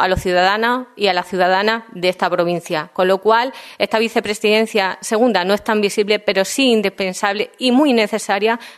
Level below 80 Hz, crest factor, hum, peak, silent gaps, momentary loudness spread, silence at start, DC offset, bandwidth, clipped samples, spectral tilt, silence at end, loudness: -46 dBFS; 16 dB; none; 0 dBFS; none; 5 LU; 0 s; under 0.1%; 13.5 kHz; under 0.1%; -4 dB/octave; 0.05 s; -17 LUFS